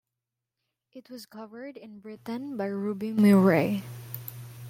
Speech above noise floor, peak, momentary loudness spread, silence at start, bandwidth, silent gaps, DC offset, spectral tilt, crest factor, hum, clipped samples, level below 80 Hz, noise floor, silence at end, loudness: 61 dB; -10 dBFS; 24 LU; 0.95 s; 16 kHz; none; under 0.1%; -7.5 dB/octave; 18 dB; none; under 0.1%; -70 dBFS; -87 dBFS; 0 s; -25 LUFS